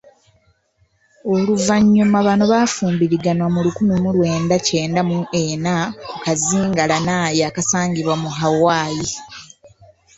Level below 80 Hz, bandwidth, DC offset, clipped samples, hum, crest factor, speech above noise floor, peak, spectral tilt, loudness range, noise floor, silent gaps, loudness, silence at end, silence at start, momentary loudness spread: -50 dBFS; 8.2 kHz; under 0.1%; under 0.1%; none; 16 dB; 45 dB; -2 dBFS; -5 dB/octave; 3 LU; -61 dBFS; none; -17 LUFS; 0.75 s; 1.25 s; 8 LU